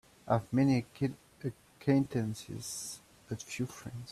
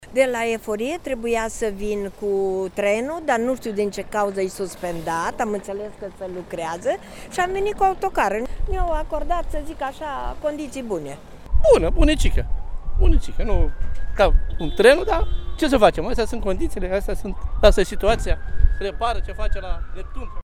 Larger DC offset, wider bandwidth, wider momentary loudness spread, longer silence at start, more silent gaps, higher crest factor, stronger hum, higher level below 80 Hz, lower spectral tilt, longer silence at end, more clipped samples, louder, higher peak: neither; about the same, 14 kHz vs 14 kHz; about the same, 15 LU vs 14 LU; first, 0.25 s vs 0 s; neither; about the same, 20 dB vs 20 dB; neither; second, -64 dBFS vs -24 dBFS; about the same, -6 dB/octave vs -5.5 dB/octave; about the same, 0 s vs 0 s; neither; second, -34 LUFS vs -23 LUFS; second, -14 dBFS vs 0 dBFS